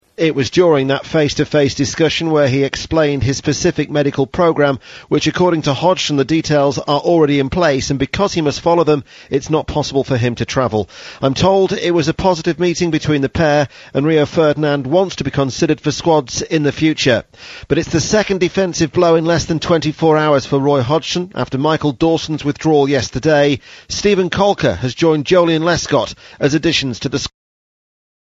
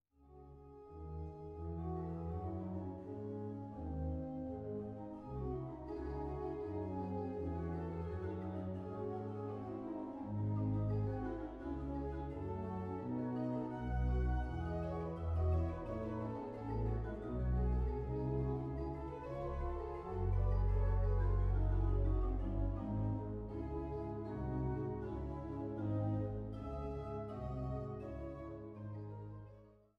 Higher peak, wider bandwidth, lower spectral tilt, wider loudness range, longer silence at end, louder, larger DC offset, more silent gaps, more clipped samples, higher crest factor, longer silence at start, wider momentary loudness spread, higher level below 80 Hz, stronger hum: first, 0 dBFS vs -26 dBFS; first, 8 kHz vs 5 kHz; second, -5 dB/octave vs -10.5 dB/octave; second, 2 LU vs 7 LU; first, 1 s vs 0.25 s; first, -15 LUFS vs -42 LUFS; neither; neither; neither; about the same, 14 dB vs 14 dB; about the same, 0.2 s vs 0.2 s; second, 6 LU vs 10 LU; about the same, -40 dBFS vs -44 dBFS; neither